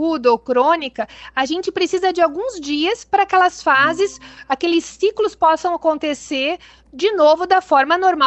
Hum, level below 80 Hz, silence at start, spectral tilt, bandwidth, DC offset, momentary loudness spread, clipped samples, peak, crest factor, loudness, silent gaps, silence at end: none; -54 dBFS; 0 s; -3 dB/octave; 8.4 kHz; under 0.1%; 8 LU; under 0.1%; -4 dBFS; 14 dB; -17 LUFS; none; 0 s